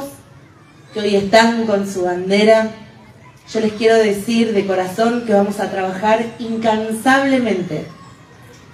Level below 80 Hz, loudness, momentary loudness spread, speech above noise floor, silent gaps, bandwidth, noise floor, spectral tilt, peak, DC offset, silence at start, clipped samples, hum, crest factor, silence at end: -54 dBFS; -16 LUFS; 11 LU; 28 dB; none; 15 kHz; -44 dBFS; -5 dB/octave; 0 dBFS; under 0.1%; 0 s; under 0.1%; none; 16 dB; 0.6 s